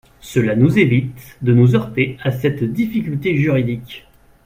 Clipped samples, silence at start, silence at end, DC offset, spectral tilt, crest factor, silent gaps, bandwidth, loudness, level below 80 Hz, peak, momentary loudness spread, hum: under 0.1%; 0.25 s; 0.45 s; under 0.1%; -8 dB/octave; 16 dB; none; 16 kHz; -17 LUFS; -46 dBFS; 0 dBFS; 11 LU; none